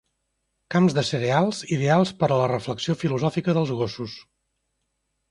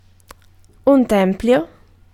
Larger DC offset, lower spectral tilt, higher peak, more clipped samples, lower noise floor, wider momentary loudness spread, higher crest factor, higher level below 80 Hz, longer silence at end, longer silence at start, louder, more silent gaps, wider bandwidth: neither; about the same, -6.5 dB/octave vs -7 dB/octave; second, -6 dBFS vs -2 dBFS; neither; first, -76 dBFS vs -48 dBFS; about the same, 8 LU vs 7 LU; about the same, 18 dB vs 16 dB; second, -58 dBFS vs -44 dBFS; first, 1.1 s vs 0.45 s; second, 0.7 s vs 0.85 s; second, -23 LUFS vs -16 LUFS; neither; second, 11 kHz vs 16 kHz